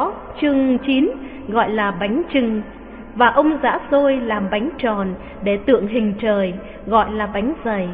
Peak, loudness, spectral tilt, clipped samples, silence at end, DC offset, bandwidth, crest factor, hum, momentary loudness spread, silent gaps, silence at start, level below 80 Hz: -2 dBFS; -19 LUFS; -10.5 dB/octave; under 0.1%; 0 s; under 0.1%; 4.6 kHz; 18 dB; none; 9 LU; none; 0 s; -42 dBFS